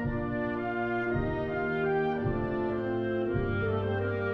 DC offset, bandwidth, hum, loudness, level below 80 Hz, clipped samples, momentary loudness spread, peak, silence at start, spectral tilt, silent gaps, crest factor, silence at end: under 0.1%; 5.8 kHz; none; -31 LUFS; -46 dBFS; under 0.1%; 3 LU; -16 dBFS; 0 s; -9.5 dB/octave; none; 14 dB; 0 s